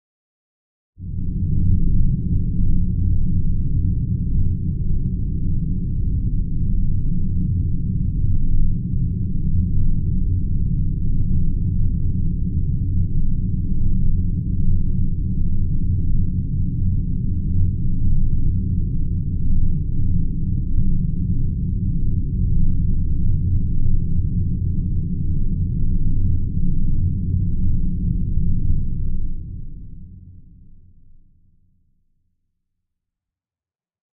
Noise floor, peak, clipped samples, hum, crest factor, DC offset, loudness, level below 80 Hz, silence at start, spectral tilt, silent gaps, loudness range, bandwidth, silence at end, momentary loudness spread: under -90 dBFS; -4 dBFS; under 0.1%; none; 12 dB; under 0.1%; -23 LUFS; -20 dBFS; 1 s; -26.5 dB/octave; none; 1 LU; 0.5 kHz; 3.75 s; 3 LU